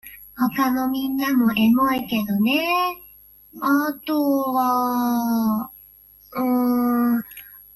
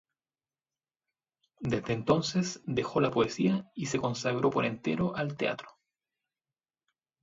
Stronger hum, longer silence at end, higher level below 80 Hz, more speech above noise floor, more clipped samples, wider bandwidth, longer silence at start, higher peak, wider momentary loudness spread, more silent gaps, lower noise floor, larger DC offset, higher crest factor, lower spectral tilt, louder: first, 50 Hz at -60 dBFS vs none; second, 0.15 s vs 1.55 s; first, -58 dBFS vs -64 dBFS; second, 29 dB vs over 60 dB; neither; first, 16 kHz vs 7.8 kHz; second, 0.05 s vs 1.6 s; first, -8 dBFS vs -12 dBFS; first, 9 LU vs 6 LU; neither; second, -50 dBFS vs under -90 dBFS; neither; second, 12 dB vs 20 dB; about the same, -5 dB/octave vs -5.5 dB/octave; first, -21 LUFS vs -30 LUFS